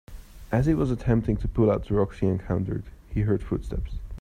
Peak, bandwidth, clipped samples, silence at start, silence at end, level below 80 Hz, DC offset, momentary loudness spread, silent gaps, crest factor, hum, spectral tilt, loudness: -8 dBFS; 10 kHz; under 0.1%; 0.1 s; 0 s; -36 dBFS; under 0.1%; 11 LU; none; 18 dB; none; -9.5 dB/octave; -26 LUFS